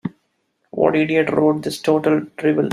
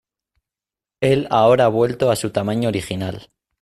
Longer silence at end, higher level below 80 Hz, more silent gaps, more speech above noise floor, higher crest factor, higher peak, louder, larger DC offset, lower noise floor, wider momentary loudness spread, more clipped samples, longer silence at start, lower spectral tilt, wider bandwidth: second, 0 s vs 0.4 s; second, -60 dBFS vs -54 dBFS; neither; second, 51 dB vs 72 dB; about the same, 16 dB vs 16 dB; about the same, -2 dBFS vs -4 dBFS; about the same, -18 LUFS vs -18 LUFS; neither; second, -68 dBFS vs -90 dBFS; second, 5 LU vs 12 LU; neither; second, 0.05 s vs 1 s; about the same, -6.5 dB/octave vs -6 dB/octave; second, 14 kHz vs 15.5 kHz